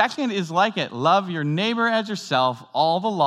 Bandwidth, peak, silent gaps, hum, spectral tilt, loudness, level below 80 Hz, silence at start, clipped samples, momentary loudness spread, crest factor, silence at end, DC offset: 13 kHz; -2 dBFS; none; none; -5 dB/octave; -22 LUFS; -84 dBFS; 0 s; under 0.1%; 4 LU; 18 dB; 0 s; under 0.1%